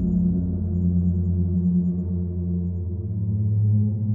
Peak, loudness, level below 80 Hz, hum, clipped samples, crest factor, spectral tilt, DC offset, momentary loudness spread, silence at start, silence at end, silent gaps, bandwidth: -12 dBFS; -24 LUFS; -40 dBFS; none; under 0.1%; 10 dB; -15 dB/octave; under 0.1%; 6 LU; 0 s; 0 s; none; 1.2 kHz